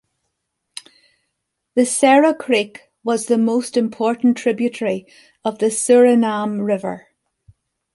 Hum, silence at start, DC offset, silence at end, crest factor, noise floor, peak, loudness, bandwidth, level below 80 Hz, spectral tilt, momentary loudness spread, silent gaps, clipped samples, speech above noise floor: none; 1.75 s; under 0.1%; 0.95 s; 16 dB; -76 dBFS; -2 dBFS; -17 LUFS; 11.5 kHz; -66 dBFS; -4 dB/octave; 16 LU; none; under 0.1%; 59 dB